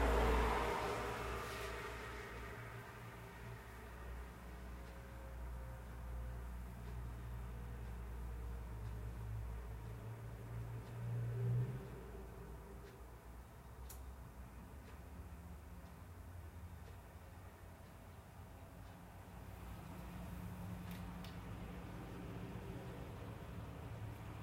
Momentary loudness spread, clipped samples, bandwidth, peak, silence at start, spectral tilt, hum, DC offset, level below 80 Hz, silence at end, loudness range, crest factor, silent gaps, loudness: 15 LU; under 0.1%; 16 kHz; -24 dBFS; 0 s; -6 dB/octave; none; under 0.1%; -50 dBFS; 0 s; 10 LU; 24 dB; none; -48 LUFS